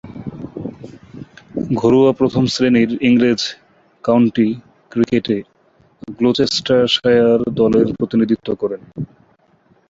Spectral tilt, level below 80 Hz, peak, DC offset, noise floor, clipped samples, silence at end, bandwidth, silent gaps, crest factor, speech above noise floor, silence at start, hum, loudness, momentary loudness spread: -6 dB/octave; -50 dBFS; -2 dBFS; under 0.1%; -55 dBFS; under 0.1%; 0.85 s; 7.8 kHz; none; 14 dB; 40 dB; 0.05 s; none; -16 LUFS; 18 LU